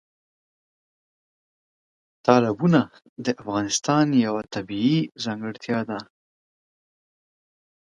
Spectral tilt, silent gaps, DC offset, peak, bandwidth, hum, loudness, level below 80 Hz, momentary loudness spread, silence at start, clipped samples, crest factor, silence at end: -5.5 dB/octave; 3.09-3.16 s; under 0.1%; 0 dBFS; 11.5 kHz; none; -23 LUFS; -64 dBFS; 11 LU; 2.25 s; under 0.1%; 24 dB; 1.9 s